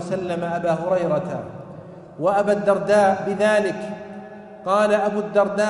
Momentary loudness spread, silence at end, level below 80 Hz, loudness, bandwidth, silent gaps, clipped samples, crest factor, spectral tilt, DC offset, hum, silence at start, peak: 20 LU; 0 s; -60 dBFS; -20 LUFS; 11.5 kHz; none; under 0.1%; 16 dB; -6 dB/octave; under 0.1%; none; 0 s; -4 dBFS